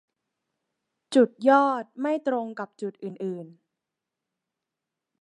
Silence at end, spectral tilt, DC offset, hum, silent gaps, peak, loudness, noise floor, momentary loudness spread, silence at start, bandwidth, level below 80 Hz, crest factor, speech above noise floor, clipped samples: 1.7 s; -6 dB/octave; under 0.1%; none; none; -6 dBFS; -25 LUFS; -86 dBFS; 15 LU; 1.1 s; 10.5 kHz; -86 dBFS; 22 dB; 62 dB; under 0.1%